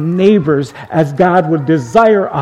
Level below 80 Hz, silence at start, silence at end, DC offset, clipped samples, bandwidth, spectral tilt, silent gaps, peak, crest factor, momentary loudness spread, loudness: -48 dBFS; 0 s; 0 s; under 0.1%; 0.1%; 11 kHz; -7.5 dB/octave; none; 0 dBFS; 12 dB; 6 LU; -12 LUFS